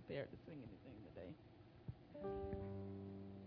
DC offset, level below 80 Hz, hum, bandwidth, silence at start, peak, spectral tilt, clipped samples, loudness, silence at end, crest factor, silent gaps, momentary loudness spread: under 0.1%; -66 dBFS; none; 5.2 kHz; 0 s; -34 dBFS; -7 dB/octave; under 0.1%; -53 LUFS; 0 s; 18 dB; none; 10 LU